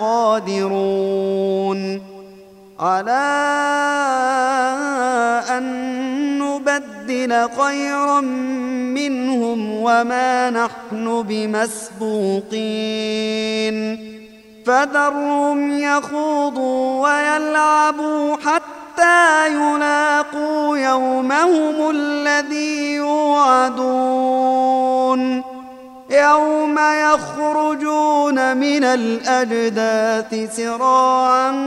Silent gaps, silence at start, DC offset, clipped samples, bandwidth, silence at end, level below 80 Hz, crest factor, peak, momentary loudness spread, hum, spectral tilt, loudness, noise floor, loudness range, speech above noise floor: none; 0 s; under 0.1%; under 0.1%; 12.5 kHz; 0 s; -64 dBFS; 16 dB; -2 dBFS; 8 LU; none; -4 dB/octave; -17 LUFS; -42 dBFS; 4 LU; 25 dB